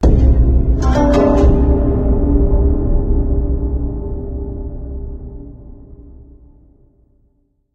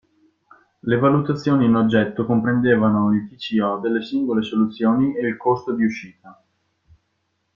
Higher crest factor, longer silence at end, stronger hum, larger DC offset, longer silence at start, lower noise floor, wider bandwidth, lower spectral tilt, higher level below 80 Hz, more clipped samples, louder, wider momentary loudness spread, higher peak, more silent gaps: about the same, 14 dB vs 18 dB; first, 1.5 s vs 1.25 s; neither; neither; second, 0 s vs 0.85 s; second, -59 dBFS vs -71 dBFS; about the same, 7 kHz vs 7 kHz; about the same, -9 dB/octave vs -8.5 dB/octave; first, -16 dBFS vs -58 dBFS; neither; first, -16 LUFS vs -20 LUFS; first, 17 LU vs 6 LU; about the same, 0 dBFS vs -2 dBFS; neither